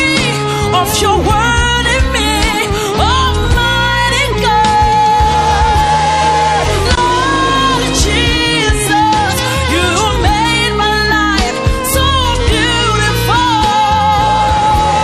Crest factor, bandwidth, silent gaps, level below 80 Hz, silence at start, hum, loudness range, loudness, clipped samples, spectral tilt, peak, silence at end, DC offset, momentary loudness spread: 12 dB; 15.5 kHz; none; -20 dBFS; 0 s; none; 1 LU; -11 LUFS; under 0.1%; -4 dB/octave; 0 dBFS; 0 s; under 0.1%; 2 LU